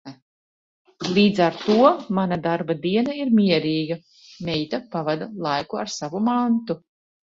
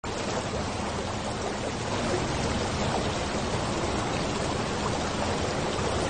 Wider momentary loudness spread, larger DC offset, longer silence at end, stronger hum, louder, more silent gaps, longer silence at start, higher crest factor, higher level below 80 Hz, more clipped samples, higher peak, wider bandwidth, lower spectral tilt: first, 11 LU vs 3 LU; second, under 0.1% vs 0.2%; first, 0.45 s vs 0 s; neither; first, -22 LUFS vs -29 LUFS; first, 0.22-0.85 s vs none; about the same, 0.05 s vs 0.05 s; first, 20 dB vs 14 dB; second, -62 dBFS vs -42 dBFS; neither; first, -2 dBFS vs -14 dBFS; second, 7.6 kHz vs 9.6 kHz; first, -6 dB/octave vs -4.5 dB/octave